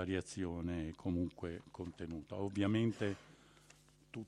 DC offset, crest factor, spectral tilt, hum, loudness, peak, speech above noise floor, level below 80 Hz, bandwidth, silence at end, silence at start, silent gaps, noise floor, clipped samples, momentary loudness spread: under 0.1%; 18 dB; -6.5 dB/octave; none; -41 LUFS; -22 dBFS; 26 dB; -60 dBFS; 11.5 kHz; 0 s; 0 s; none; -66 dBFS; under 0.1%; 12 LU